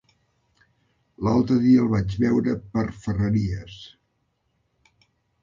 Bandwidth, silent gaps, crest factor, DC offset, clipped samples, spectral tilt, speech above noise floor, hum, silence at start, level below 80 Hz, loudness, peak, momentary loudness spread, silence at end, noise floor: 7.4 kHz; none; 16 dB; under 0.1%; under 0.1%; -8.5 dB/octave; 50 dB; none; 1.2 s; -46 dBFS; -22 LUFS; -8 dBFS; 13 LU; 1.55 s; -72 dBFS